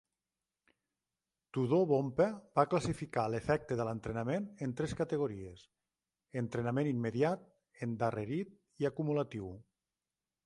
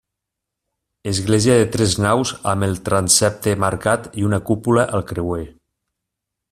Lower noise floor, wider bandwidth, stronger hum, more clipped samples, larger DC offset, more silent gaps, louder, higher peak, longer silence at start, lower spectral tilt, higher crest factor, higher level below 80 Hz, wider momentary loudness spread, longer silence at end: first, under -90 dBFS vs -82 dBFS; second, 11.5 kHz vs 14.5 kHz; neither; neither; neither; neither; second, -35 LUFS vs -18 LUFS; second, -14 dBFS vs 0 dBFS; first, 1.55 s vs 1.05 s; first, -7.5 dB/octave vs -4.5 dB/octave; about the same, 22 dB vs 20 dB; second, -64 dBFS vs -46 dBFS; about the same, 12 LU vs 10 LU; second, 0.85 s vs 1 s